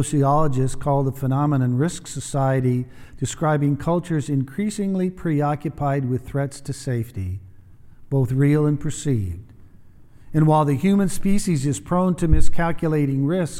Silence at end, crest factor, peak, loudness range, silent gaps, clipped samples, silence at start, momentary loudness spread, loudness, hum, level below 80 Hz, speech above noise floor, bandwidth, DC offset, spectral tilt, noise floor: 0 s; 18 dB; -2 dBFS; 4 LU; none; under 0.1%; 0 s; 9 LU; -22 LUFS; none; -34 dBFS; 25 dB; 14.5 kHz; under 0.1%; -7 dB/octave; -45 dBFS